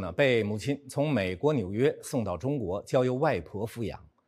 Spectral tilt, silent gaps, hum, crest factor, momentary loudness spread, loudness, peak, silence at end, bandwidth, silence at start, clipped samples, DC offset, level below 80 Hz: -6.5 dB/octave; none; none; 18 dB; 9 LU; -29 LUFS; -10 dBFS; 0.25 s; 15.5 kHz; 0 s; under 0.1%; under 0.1%; -58 dBFS